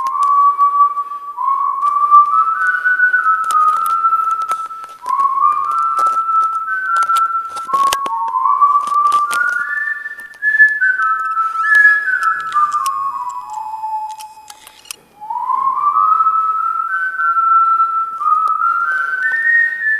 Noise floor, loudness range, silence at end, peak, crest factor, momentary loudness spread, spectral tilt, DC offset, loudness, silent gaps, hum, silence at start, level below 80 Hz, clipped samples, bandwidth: -39 dBFS; 5 LU; 0 s; 0 dBFS; 14 dB; 13 LU; 0.5 dB/octave; under 0.1%; -14 LUFS; none; none; 0 s; -64 dBFS; under 0.1%; 15 kHz